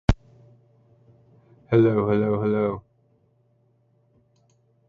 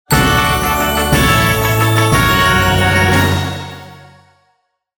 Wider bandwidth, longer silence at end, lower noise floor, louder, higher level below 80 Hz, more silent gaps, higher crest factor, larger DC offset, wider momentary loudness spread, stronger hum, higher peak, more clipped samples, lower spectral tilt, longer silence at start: second, 7.4 kHz vs over 20 kHz; first, 2.1 s vs 1.05 s; about the same, -64 dBFS vs -63 dBFS; second, -22 LUFS vs -12 LUFS; second, -38 dBFS vs -26 dBFS; neither; first, 26 dB vs 14 dB; neither; about the same, 10 LU vs 9 LU; neither; about the same, 0 dBFS vs 0 dBFS; neither; first, -9 dB/octave vs -4.5 dB/octave; about the same, 0.1 s vs 0.1 s